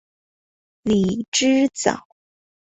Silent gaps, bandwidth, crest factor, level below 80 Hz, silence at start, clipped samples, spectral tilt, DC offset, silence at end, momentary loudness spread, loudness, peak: 1.28-1.32 s; 8.4 kHz; 20 dB; -54 dBFS; 0.85 s; under 0.1%; -4 dB/octave; under 0.1%; 0.8 s; 10 LU; -20 LUFS; -2 dBFS